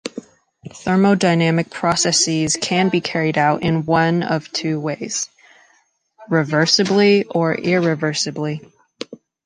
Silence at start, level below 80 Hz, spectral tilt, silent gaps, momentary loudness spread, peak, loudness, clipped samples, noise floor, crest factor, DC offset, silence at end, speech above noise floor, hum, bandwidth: 0.05 s; -56 dBFS; -4 dB/octave; none; 14 LU; -2 dBFS; -17 LUFS; under 0.1%; -60 dBFS; 16 dB; under 0.1%; 0.3 s; 42 dB; none; 10.5 kHz